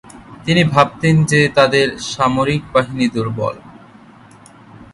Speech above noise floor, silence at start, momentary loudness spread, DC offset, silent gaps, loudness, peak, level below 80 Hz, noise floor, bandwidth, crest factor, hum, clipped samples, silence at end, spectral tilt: 28 dB; 0.15 s; 10 LU; under 0.1%; none; -15 LUFS; 0 dBFS; -46 dBFS; -43 dBFS; 11.5 kHz; 16 dB; none; under 0.1%; 0.1 s; -5.5 dB/octave